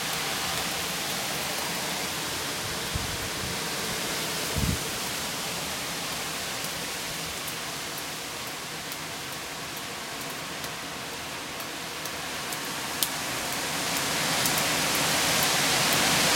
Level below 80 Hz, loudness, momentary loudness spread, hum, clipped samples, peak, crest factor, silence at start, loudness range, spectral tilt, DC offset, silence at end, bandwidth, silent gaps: -50 dBFS; -28 LUFS; 11 LU; none; under 0.1%; 0 dBFS; 30 dB; 0 s; 9 LU; -1.5 dB/octave; under 0.1%; 0 s; 17 kHz; none